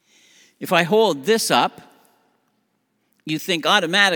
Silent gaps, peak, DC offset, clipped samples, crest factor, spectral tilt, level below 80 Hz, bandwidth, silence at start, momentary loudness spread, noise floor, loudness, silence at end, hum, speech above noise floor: none; 0 dBFS; under 0.1%; under 0.1%; 20 dB; -3 dB/octave; -78 dBFS; over 20 kHz; 0.6 s; 12 LU; -69 dBFS; -18 LUFS; 0 s; none; 51 dB